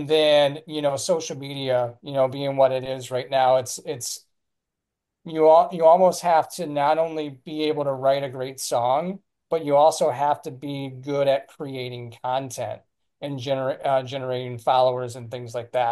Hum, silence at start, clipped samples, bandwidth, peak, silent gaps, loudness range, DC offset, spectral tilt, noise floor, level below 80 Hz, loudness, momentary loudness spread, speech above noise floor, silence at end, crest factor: none; 0 s; under 0.1%; 12.5 kHz; -4 dBFS; none; 7 LU; under 0.1%; -4.5 dB/octave; -84 dBFS; -72 dBFS; -23 LUFS; 15 LU; 61 dB; 0 s; 18 dB